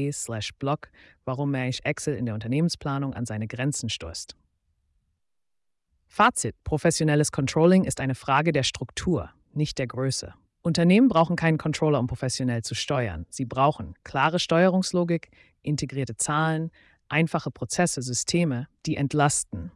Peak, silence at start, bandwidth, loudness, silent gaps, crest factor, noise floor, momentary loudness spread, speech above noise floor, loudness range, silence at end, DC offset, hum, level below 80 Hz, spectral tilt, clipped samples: -8 dBFS; 0 s; 12 kHz; -25 LUFS; none; 16 dB; -86 dBFS; 11 LU; 61 dB; 6 LU; 0.05 s; under 0.1%; none; -52 dBFS; -5 dB/octave; under 0.1%